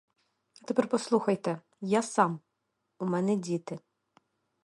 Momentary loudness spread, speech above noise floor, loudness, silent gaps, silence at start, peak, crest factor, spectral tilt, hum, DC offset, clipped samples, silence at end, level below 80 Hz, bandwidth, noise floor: 15 LU; 52 dB; -30 LUFS; none; 0.7 s; -8 dBFS; 22 dB; -6 dB/octave; none; under 0.1%; under 0.1%; 0.85 s; -78 dBFS; 11.5 kHz; -81 dBFS